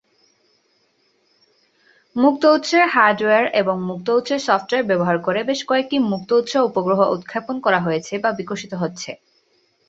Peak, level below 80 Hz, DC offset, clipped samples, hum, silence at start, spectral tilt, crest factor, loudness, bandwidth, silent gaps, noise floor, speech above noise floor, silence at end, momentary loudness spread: -2 dBFS; -64 dBFS; under 0.1%; under 0.1%; none; 2.15 s; -5 dB/octave; 18 dB; -19 LUFS; 8 kHz; none; -63 dBFS; 45 dB; 0.75 s; 12 LU